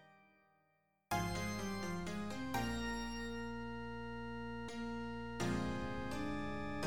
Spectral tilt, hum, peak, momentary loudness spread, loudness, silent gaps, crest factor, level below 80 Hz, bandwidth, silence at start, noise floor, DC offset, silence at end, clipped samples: -5 dB/octave; none; -24 dBFS; 6 LU; -42 LUFS; none; 18 dB; -56 dBFS; 19 kHz; 0 s; -79 dBFS; 0.2%; 0 s; under 0.1%